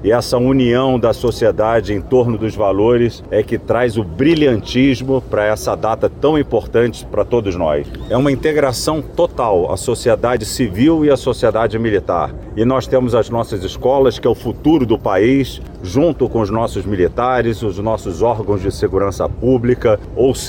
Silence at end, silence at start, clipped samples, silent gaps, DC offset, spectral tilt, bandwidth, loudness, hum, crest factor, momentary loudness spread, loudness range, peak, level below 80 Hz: 0 s; 0 s; under 0.1%; none; under 0.1%; -6.5 dB/octave; 17 kHz; -16 LUFS; none; 12 dB; 6 LU; 2 LU; -4 dBFS; -34 dBFS